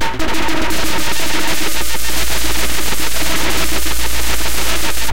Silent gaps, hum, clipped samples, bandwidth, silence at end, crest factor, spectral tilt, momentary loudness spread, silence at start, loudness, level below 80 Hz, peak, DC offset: none; none; under 0.1%; 17 kHz; 0 s; 14 dB; -2 dB/octave; 2 LU; 0 s; -18 LUFS; -28 dBFS; -2 dBFS; 30%